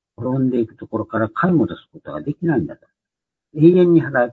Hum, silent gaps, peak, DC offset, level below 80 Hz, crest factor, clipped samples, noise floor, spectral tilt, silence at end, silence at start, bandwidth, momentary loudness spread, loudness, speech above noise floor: none; none; 0 dBFS; under 0.1%; -56 dBFS; 18 dB; under 0.1%; -85 dBFS; -10.5 dB/octave; 0 s; 0.2 s; 4.2 kHz; 17 LU; -18 LUFS; 68 dB